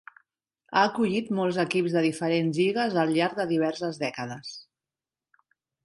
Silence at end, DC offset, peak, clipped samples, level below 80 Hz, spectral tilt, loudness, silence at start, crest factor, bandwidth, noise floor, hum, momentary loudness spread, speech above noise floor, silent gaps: 1.2 s; under 0.1%; -6 dBFS; under 0.1%; -72 dBFS; -6 dB/octave; -26 LUFS; 0.7 s; 20 dB; 11.5 kHz; under -90 dBFS; none; 11 LU; over 64 dB; none